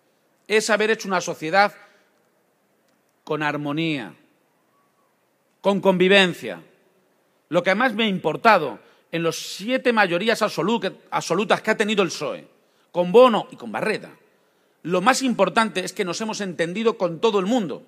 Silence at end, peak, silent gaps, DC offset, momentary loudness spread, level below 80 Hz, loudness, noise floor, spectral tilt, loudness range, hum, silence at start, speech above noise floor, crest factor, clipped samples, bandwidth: 0.05 s; 0 dBFS; none; under 0.1%; 13 LU; -76 dBFS; -21 LUFS; -66 dBFS; -4.5 dB/octave; 6 LU; none; 0.5 s; 45 dB; 22 dB; under 0.1%; 15.5 kHz